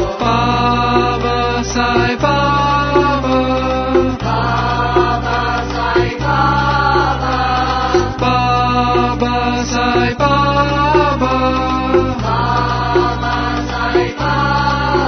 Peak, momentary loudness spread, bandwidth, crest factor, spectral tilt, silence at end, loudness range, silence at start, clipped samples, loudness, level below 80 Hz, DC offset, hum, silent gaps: 0 dBFS; 3 LU; 6.6 kHz; 14 dB; -6 dB/octave; 0 s; 1 LU; 0 s; under 0.1%; -14 LUFS; -26 dBFS; under 0.1%; none; none